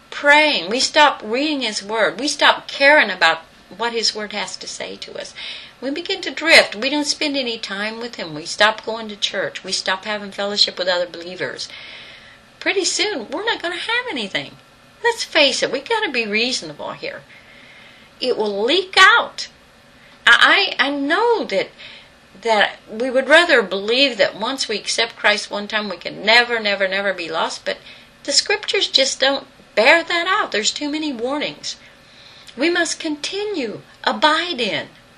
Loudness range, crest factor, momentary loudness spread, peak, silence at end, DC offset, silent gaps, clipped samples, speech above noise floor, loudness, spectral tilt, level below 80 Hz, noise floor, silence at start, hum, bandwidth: 7 LU; 20 dB; 16 LU; 0 dBFS; 0.3 s; under 0.1%; none; under 0.1%; 29 dB; -17 LUFS; -1.5 dB/octave; -60 dBFS; -48 dBFS; 0.1 s; none; 13.5 kHz